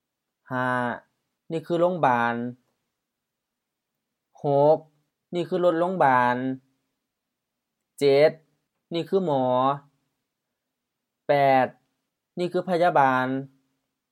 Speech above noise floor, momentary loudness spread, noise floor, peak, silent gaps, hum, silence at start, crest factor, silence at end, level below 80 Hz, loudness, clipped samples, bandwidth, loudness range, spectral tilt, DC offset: 62 dB; 14 LU; -84 dBFS; -6 dBFS; none; none; 0.5 s; 20 dB; 0.65 s; -80 dBFS; -23 LUFS; under 0.1%; 13.5 kHz; 4 LU; -7 dB/octave; under 0.1%